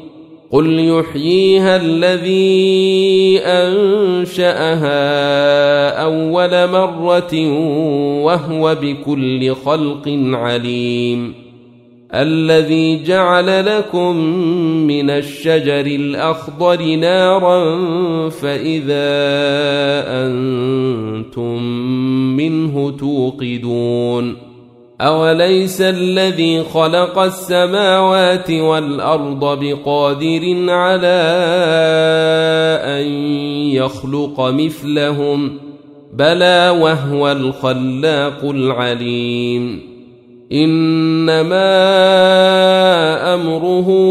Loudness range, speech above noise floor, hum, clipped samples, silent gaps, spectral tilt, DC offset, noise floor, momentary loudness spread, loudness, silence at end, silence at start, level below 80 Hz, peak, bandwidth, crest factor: 5 LU; 30 dB; none; under 0.1%; none; -6 dB/octave; under 0.1%; -43 dBFS; 7 LU; -14 LUFS; 0 s; 0 s; -56 dBFS; 0 dBFS; 14.5 kHz; 12 dB